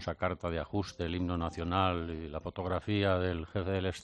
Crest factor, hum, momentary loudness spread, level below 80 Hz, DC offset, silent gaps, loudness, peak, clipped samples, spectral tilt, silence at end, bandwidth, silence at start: 20 dB; none; 7 LU; -50 dBFS; under 0.1%; none; -34 LUFS; -14 dBFS; under 0.1%; -7 dB/octave; 0 s; 9.2 kHz; 0 s